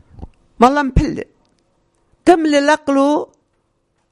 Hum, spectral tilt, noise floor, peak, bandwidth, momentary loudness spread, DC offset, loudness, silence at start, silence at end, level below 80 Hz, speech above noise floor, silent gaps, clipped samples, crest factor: none; -6 dB/octave; -65 dBFS; 0 dBFS; 11.5 kHz; 14 LU; under 0.1%; -15 LUFS; 0.2 s; 0.85 s; -32 dBFS; 52 dB; none; 0.3%; 16 dB